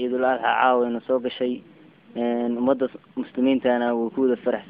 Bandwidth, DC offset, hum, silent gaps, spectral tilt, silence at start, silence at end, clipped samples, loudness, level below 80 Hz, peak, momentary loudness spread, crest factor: 4.7 kHz; under 0.1%; none; none; -9 dB/octave; 0 s; 0 s; under 0.1%; -23 LUFS; -66 dBFS; -6 dBFS; 9 LU; 18 dB